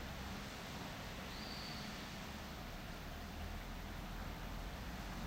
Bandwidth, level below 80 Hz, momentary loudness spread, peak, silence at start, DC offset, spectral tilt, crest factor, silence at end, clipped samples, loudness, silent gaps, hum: 16 kHz; -52 dBFS; 3 LU; -34 dBFS; 0 s; under 0.1%; -4.5 dB/octave; 14 dB; 0 s; under 0.1%; -48 LUFS; none; none